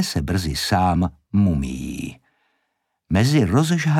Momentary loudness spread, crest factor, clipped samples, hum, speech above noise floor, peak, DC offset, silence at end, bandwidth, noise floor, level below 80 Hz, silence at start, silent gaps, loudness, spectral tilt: 12 LU; 16 dB; under 0.1%; none; 55 dB; -6 dBFS; under 0.1%; 0 s; 16.5 kHz; -74 dBFS; -38 dBFS; 0 s; none; -20 LUFS; -6 dB/octave